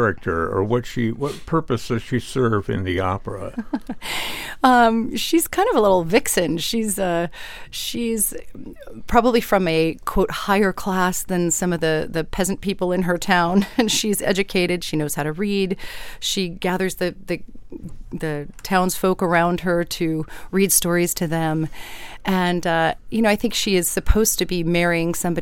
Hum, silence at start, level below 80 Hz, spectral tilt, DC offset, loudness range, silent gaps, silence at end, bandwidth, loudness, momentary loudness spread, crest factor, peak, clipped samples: none; 0 s; -36 dBFS; -4 dB/octave; under 0.1%; 5 LU; none; 0 s; 17 kHz; -21 LUFS; 12 LU; 20 dB; -2 dBFS; under 0.1%